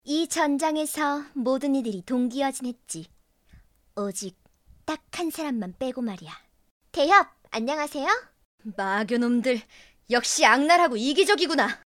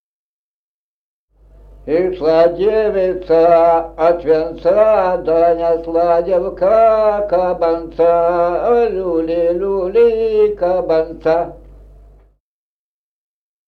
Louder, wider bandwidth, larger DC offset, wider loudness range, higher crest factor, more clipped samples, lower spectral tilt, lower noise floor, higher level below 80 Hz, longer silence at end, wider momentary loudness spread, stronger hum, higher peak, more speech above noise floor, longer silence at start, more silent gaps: second, -24 LUFS vs -14 LUFS; first, 17 kHz vs 5.8 kHz; neither; first, 11 LU vs 4 LU; first, 22 dB vs 14 dB; neither; second, -2.5 dB/octave vs -8 dB/octave; second, -56 dBFS vs under -90 dBFS; second, -64 dBFS vs -40 dBFS; second, 0.2 s vs 2.1 s; first, 16 LU vs 6 LU; neither; second, -4 dBFS vs 0 dBFS; second, 32 dB vs over 76 dB; second, 0.05 s vs 1.85 s; first, 6.71-6.80 s, 8.45-8.58 s vs none